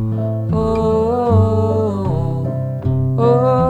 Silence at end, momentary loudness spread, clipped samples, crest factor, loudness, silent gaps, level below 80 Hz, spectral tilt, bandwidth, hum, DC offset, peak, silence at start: 0 s; 6 LU; under 0.1%; 14 dB; -17 LUFS; none; -34 dBFS; -10 dB/octave; 8.2 kHz; none; under 0.1%; -2 dBFS; 0 s